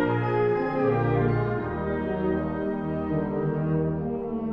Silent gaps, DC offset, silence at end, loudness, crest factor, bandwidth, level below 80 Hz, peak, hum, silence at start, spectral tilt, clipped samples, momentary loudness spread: none; under 0.1%; 0 s; -26 LUFS; 14 dB; 5.4 kHz; -44 dBFS; -12 dBFS; none; 0 s; -10.5 dB/octave; under 0.1%; 5 LU